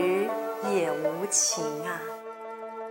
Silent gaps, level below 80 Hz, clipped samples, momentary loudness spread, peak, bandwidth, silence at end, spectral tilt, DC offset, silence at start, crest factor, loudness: none; -80 dBFS; under 0.1%; 16 LU; -10 dBFS; 16 kHz; 0 s; -2.5 dB/octave; under 0.1%; 0 s; 18 dB; -28 LUFS